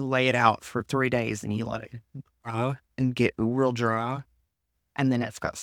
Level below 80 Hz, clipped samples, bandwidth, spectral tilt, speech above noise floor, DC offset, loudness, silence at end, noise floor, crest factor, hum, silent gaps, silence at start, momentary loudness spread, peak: -58 dBFS; under 0.1%; 15.5 kHz; -6 dB/octave; 52 dB; under 0.1%; -27 LUFS; 0 s; -79 dBFS; 22 dB; none; none; 0 s; 14 LU; -6 dBFS